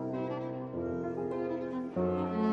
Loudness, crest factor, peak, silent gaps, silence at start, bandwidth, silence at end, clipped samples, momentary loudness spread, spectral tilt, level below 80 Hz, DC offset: -35 LUFS; 14 dB; -20 dBFS; none; 0 s; 7.2 kHz; 0 s; under 0.1%; 5 LU; -9.5 dB/octave; -62 dBFS; under 0.1%